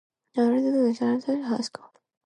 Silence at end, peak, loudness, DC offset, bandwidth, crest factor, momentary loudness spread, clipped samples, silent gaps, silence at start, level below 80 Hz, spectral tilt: 0.6 s; -12 dBFS; -25 LUFS; under 0.1%; 10 kHz; 14 dB; 11 LU; under 0.1%; none; 0.35 s; -78 dBFS; -5.5 dB/octave